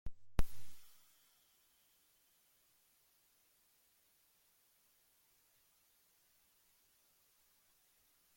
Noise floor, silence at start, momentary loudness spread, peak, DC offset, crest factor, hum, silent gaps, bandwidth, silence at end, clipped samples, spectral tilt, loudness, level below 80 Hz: -75 dBFS; 0.05 s; 23 LU; -18 dBFS; under 0.1%; 26 dB; none; none; 16.5 kHz; 7.5 s; under 0.1%; -5 dB/octave; -47 LUFS; -52 dBFS